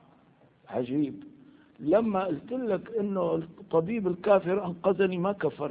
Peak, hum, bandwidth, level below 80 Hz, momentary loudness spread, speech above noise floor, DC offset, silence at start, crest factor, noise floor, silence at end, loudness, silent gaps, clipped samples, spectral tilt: -10 dBFS; none; 4.8 kHz; -66 dBFS; 9 LU; 33 dB; under 0.1%; 0.7 s; 20 dB; -61 dBFS; 0 s; -28 LUFS; none; under 0.1%; -11.5 dB/octave